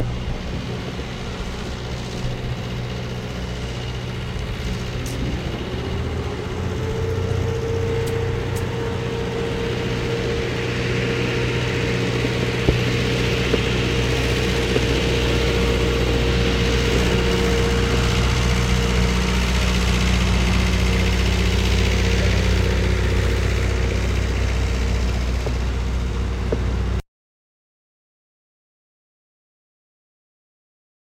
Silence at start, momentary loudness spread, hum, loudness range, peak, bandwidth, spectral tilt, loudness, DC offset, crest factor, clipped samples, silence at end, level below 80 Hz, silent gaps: 0 s; 9 LU; none; 9 LU; 0 dBFS; 15.5 kHz; -5.5 dB/octave; -22 LUFS; under 0.1%; 20 dB; under 0.1%; 4 s; -26 dBFS; none